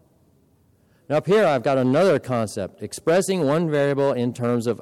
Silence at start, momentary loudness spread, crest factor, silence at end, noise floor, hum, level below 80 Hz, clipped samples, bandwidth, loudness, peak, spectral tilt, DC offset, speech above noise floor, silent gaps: 1.1 s; 8 LU; 10 dB; 0.05 s; -60 dBFS; none; -64 dBFS; under 0.1%; 15.5 kHz; -21 LUFS; -12 dBFS; -6 dB/octave; under 0.1%; 39 dB; none